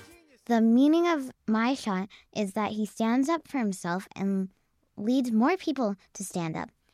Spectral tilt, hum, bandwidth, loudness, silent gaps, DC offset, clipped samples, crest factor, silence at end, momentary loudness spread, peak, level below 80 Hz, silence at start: -5.5 dB/octave; none; 14.5 kHz; -28 LUFS; none; under 0.1%; under 0.1%; 16 dB; 0.25 s; 12 LU; -12 dBFS; -70 dBFS; 0 s